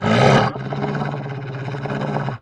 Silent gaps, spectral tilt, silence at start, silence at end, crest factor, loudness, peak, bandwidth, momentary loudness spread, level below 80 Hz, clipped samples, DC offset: none; -6.5 dB/octave; 0 s; 0.05 s; 20 dB; -20 LUFS; 0 dBFS; 10 kHz; 14 LU; -46 dBFS; under 0.1%; under 0.1%